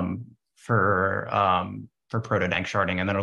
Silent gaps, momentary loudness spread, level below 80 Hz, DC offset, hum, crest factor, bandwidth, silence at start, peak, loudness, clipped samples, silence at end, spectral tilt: none; 12 LU; -58 dBFS; under 0.1%; none; 18 dB; 10.5 kHz; 0 s; -8 dBFS; -25 LUFS; under 0.1%; 0 s; -6.5 dB/octave